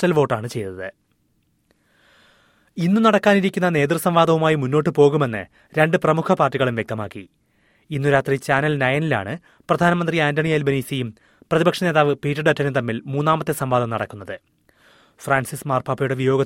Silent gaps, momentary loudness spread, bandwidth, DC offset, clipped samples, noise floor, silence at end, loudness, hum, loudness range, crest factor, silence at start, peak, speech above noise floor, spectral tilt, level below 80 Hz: none; 14 LU; 16.5 kHz; under 0.1%; under 0.1%; -65 dBFS; 0 s; -20 LUFS; none; 5 LU; 18 dB; 0 s; -2 dBFS; 46 dB; -6.5 dB/octave; -56 dBFS